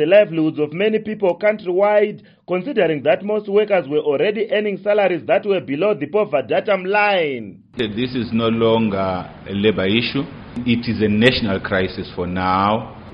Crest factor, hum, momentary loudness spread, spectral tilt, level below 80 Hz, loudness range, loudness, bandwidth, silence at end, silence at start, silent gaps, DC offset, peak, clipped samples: 18 dB; none; 9 LU; -4 dB/octave; -48 dBFS; 1 LU; -18 LUFS; 5.8 kHz; 0 s; 0 s; none; under 0.1%; 0 dBFS; under 0.1%